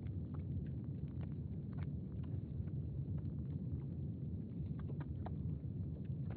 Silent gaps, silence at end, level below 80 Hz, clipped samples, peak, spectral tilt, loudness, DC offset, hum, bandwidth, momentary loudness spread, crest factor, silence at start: none; 0 s; -54 dBFS; under 0.1%; -30 dBFS; -11 dB/octave; -45 LUFS; under 0.1%; none; 4.3 kHz; 2 LU; 12 dB; 0 s